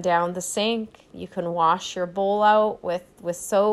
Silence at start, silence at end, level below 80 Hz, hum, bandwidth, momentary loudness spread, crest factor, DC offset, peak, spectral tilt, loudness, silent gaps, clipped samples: 0 s; 0 s; -62 dBFS; none; 14 kHz; 13 LU; 16 dB; under 0.1%; -8 dBFS; -4 dB/octave; -23 LUFS; none; under 0.1%